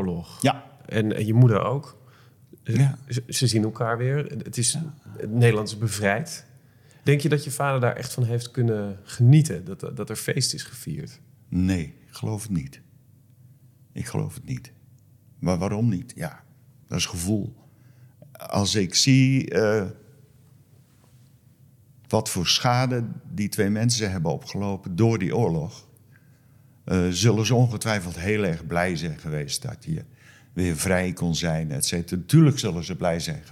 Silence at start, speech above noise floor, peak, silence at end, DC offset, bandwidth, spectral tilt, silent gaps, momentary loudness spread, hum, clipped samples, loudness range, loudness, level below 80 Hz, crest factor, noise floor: 0 s; 32 dB; -6 dBFS; 0 s; under 0.1%; 15.5 kHz; -5 dB/octave; none; 15 LU; none; under 0.1%; 7 LU; -24 LUFS; -56 dBFS; 18 dB; -55 dBFS